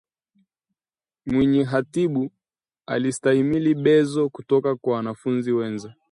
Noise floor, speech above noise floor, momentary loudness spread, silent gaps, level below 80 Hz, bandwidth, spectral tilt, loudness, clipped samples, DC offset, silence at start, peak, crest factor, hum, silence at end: under -90 dBFS; over 69 dB; 10 LU; none; -58 dBFS; 11 kHz; -6.5 dB/octave; -22 LUFS; under 0.1%; under 0.1%; 1.25 s; -6 dBFS; 16 dB; none; 0.2 s